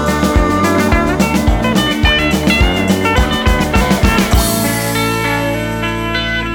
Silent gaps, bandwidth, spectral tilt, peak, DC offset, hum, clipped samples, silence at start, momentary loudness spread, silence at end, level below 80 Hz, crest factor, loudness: none; over 20 kHz; -4.5 dB/octave; 0 dBFS; under 0.1%; none; under 0.1%; 0 s; 4 LU; 0 s; -20 dBFS; 12 dB; -13 LUFS